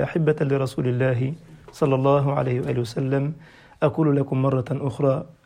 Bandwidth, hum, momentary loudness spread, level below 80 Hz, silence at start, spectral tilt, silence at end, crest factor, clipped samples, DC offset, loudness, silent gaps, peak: 10.5 kHz; none; 7 LU; -56 dBFS; 0 s; -8.5 dB/octave; 0.2 s; 16 dB; under 0.1%; under 0.1%; -23 LUFS; none; -6 dBFS